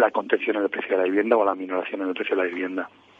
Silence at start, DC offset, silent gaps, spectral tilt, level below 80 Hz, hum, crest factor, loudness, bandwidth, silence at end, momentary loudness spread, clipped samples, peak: 0 s; under 0.1%; none; -6.5 dB/octave; -74 dBFS; none; 20 dB; -24 LUFS; 4.8 kHz; 0.3 s; 8 LU; under 0.1%; -4 dBFS